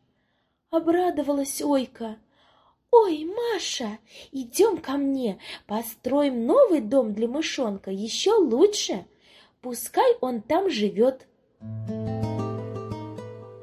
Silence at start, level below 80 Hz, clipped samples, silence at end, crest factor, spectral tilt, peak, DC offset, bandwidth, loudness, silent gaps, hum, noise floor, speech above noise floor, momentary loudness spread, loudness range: 0.7 s; -60 dBFS; under 0.1%; 0 s; 20 dB; -4.5 dB/octave; -4 dBFS; under 0.1%; 15 kHz; -24 LUFS; none; none; -72 dBFS; 48 dB; 17 LU; 4 LU